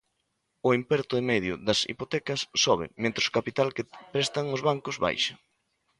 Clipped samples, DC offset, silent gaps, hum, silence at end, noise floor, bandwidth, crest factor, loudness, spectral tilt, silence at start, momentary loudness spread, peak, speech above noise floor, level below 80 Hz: under 0.1%; under 0.1%; none; none; 0.65 s; -77 dBFS; 11.5 kHz; 20 dB; -27 LUFS; -3.5 dB/octave; 0.65 s; 5 LU; -8 dBFS; 50 dB; -60 dBFS